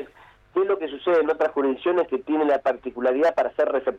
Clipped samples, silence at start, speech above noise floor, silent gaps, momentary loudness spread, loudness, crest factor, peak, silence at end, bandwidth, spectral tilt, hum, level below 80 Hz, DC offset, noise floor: under 0.1%; 0 s; 29 dB; none; 5 LU; -23 LUFS; 12 dB; -12 dBFS; 0 s; 7.4 kHz; -6 dB/octave; none; -62 dBFS; under 0.1%; -52 dBFS